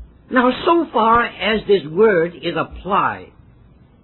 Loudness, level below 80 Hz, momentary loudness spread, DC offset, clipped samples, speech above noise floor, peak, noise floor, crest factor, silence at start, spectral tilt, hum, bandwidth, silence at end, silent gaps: -17 LUFS; -44 dBFS; 8 LU; under 0.1%; under 0.1%; 31 dB; -2 dBFS; -48 dBFS; 16 dB; 0 s; -9 dB/octave; none; 4.3 kHz; 0.8 s; none